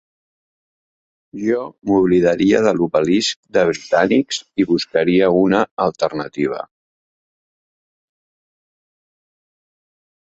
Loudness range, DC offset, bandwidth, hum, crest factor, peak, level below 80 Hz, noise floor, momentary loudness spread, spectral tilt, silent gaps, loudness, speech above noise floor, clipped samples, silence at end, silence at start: 11 LU; under 0.1%; 8 kHz; none; 18 dB; 0 dBFS; -54 dBFS; under -90 dBFS; 8 LU; -5.5 dB/octave; 3.36-3.43 s, 5.71-5.77 s; -17 LUFS; over 74 dB; under 0.1%; 3.65 s; 1.35 s